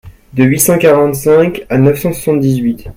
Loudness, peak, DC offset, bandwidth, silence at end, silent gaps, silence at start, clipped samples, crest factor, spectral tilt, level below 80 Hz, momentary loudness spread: -11 LUFS; 0 dBFS; under 0.1%; 17 kHz; 0.05 s; none; 0.05 s; under 0.1%; 10 dB; -6 dB/octave; -38 dBFS; 6 LU